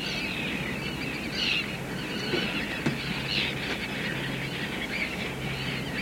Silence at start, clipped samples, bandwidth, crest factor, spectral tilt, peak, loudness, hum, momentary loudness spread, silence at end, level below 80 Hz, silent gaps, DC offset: 0 s; under 0.1%; 16.5 kHz; 16 dB; -4 dB/octave; -14 dBFS; -29 LUFS; none; 5 LU; 0 s; -50 dBFS; none; under 0.1%